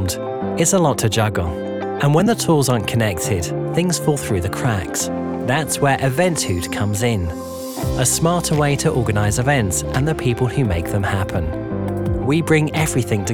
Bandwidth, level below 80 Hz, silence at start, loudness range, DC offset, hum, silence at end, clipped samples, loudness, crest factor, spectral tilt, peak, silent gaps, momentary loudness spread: 19.5 kHz; -38 dBFS; 0 s; 2 LU; under 0.1%; none; 0 s; under 0.1%; -19 LUFS; 16 dB; -5 dB/octave; -4 dBFS; none; 7 LU